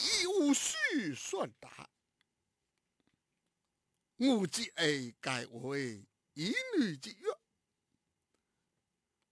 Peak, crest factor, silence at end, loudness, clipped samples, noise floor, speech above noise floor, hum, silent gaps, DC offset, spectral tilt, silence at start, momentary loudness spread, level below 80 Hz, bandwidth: -18 dBFS; 20 dB; 1.95 s; -34 LUFS; under 0.1%; -86 dBFS; 51 dB; none; none; under 0.1%; -3 dB/octave; 0 s; 19 LU; -78 dBFS; 11 kHz